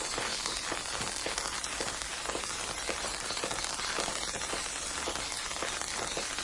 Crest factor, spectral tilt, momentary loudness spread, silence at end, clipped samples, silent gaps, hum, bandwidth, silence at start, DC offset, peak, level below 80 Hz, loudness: 24 dB; -0.5 dB/octave; 2 LU; 0 s; under 0.1%; none; none; 11.5 kHz; 0 s; under 0.1%; -10 dBFS; -52 dBFS; -33 LUFS